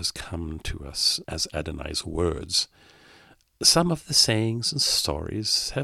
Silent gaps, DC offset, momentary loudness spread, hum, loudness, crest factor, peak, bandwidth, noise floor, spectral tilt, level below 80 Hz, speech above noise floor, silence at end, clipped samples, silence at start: none; under 0.1%; 14 LU; none; -24 LUFS; 22 dB; -4 dBFS; 16.5 kHz; -55 dBFS; -3 dB/octave; -42 dBFS; 30 dB; 0 s; under 0.1%; 0 s